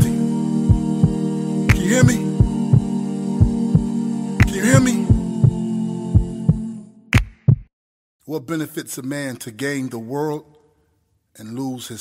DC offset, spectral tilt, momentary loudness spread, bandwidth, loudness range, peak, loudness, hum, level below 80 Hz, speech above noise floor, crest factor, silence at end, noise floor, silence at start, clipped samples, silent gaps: under 0.1%; -6.5 dB/octave; 13 LU; 16 kHz; 9 LU; 0 dBFS; -19 LUFS; none; -30 dBFS; 43 dB; 18 dB; 0 s; -65 dBFS; 0 s; under 0.1%; 7.73-8.19 s